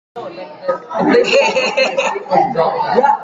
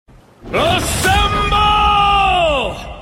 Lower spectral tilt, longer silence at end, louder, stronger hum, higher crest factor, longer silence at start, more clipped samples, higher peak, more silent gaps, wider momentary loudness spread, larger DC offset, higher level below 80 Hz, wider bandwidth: about the same, -4 dB/octave vs -3.5 dB/octave; about the same, 0 s vs 0 s; about the same, -14 LUFS vs -14 LUFS; neither; about the same, 14 dB vs 12 dB; second, 0.15 s vs 0.45 s; neither; about the same, 0 dBFS vs -2 dBFS; neither; first, 14 LU vs 7 LU; neither; second, -58 dBFS vs -26 dBFS; second, 7.8 kHz vs 16.5 kHz